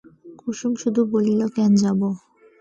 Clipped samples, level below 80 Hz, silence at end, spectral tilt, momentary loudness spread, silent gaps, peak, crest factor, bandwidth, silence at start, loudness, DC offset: under 0.1%; -64 dBFS; 0.45 s; -7 dB/octave; 13 LU; none; -8 dBFS; 12 dB; 8 kHz; 0.25 s; -21 LUFS; under 0.1%